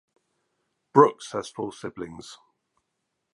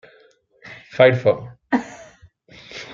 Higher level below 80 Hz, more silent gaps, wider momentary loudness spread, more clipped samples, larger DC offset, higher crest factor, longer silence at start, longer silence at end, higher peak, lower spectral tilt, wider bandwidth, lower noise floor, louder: second, -68 dBFS vs -60 dBFS; neither; second, 21 LU vs 25 LU; neither; neither; first, 26 dB vs 20 dB; first, 0.95 s vs 0.65 s; first, 1 s vs 0 s; about the same, -2 dBFS vs -2 dBFS; about the same, -6 dB/octave vs -6.5 dB/octave; first, 11.5 kHz vs 7.4 kHz; first, -80 dBFS vs -55 dBFS; second, -23 LUFS vs -18 LUFS